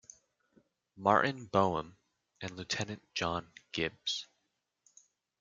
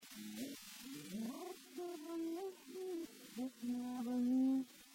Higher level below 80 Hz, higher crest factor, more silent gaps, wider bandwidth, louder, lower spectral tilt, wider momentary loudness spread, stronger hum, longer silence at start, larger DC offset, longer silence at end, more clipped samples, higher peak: first, -68 dBFS vs -84 dBFS; first, 26 dB vs 14 dB; neither; second, 9.4 kHz vs 16.5 kHz; first, -34 LUFS vs -44 LUFS; about the same, -4 dB/octave vs -4.5 dB/octave; about the same, 16 LU vs 14 LU; neither; first, 0.95 s vs 0 s; neither; first, 1.15 s vs 0 s; neither; first, -10 dBFS vs -30 dBFS